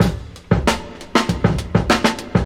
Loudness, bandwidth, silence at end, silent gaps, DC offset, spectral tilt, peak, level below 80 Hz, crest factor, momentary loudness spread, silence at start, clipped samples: -19 LUFS; 16.5 kHz; 0 s; none; under 0.1%; -5.5 dB/octave; 0 dBFS; -30 dBFS; 18 dB; 4 LU; 0 s; under 0.1%